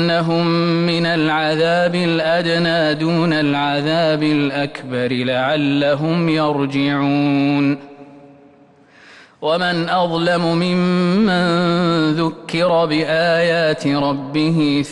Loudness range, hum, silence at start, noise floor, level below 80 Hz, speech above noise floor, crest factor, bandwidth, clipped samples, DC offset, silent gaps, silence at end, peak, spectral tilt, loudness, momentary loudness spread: 4 LU; none; 0 s; -48 dBFS; -54 dBFS; 32 dB; 10 dB; 10.5 kHz; under 0.1%; under 0.1%; none; 0 s; -6 dBFS; -6.5 dB/octave; -17 LUFS; 4 LU